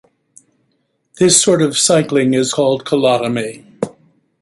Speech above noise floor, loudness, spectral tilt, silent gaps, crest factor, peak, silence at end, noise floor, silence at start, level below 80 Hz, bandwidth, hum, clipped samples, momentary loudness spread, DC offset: 51 dB; -13 LUFS; -3.5 dB/octave; none; 16 dB; 0 dBFS; 0.5 s; -65 dBFS; 1.15 s; -58 dBFS; 12 kHz; none; under 0.1%; 16 LU; under 0.1%